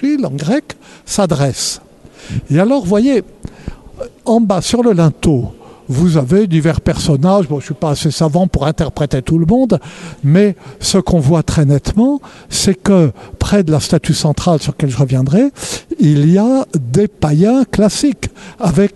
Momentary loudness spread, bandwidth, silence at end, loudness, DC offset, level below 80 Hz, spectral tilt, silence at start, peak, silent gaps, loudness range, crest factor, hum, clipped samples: 11 LU; 12.5 kHz; 0.05 s; -13 LUFS; under 0.1%; -32 dBFS; -6 dB/octave; 0 s; 0 dBFS; none; 3 LU; 12 dB; none; under 0.1%